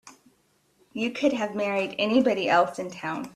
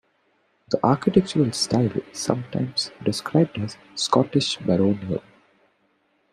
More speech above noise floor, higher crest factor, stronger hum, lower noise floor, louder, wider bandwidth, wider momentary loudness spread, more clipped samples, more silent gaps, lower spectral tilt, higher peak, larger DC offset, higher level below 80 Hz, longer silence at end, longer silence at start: about the same, 41 dB vs 44 dB; about the same, 18 dB vs 20 dB; neither; about the same, -66 dBFS vs -66 dBFS; about the same, -25 LUFS vs -23 LUFS; about the same, 13.5 kHz vs 13.5 kHz; first, 11 LU vs 8 LU; neither; neither; about the same, -5 dB/octave vs -5.5 dB/octave; second, -8 dBFS vs -4 dBFS; neither; second, -70 dBFS vs -58 dBFS; second, 0.05 s vs 1.15 s; second, 0.05 s vs 0.7 s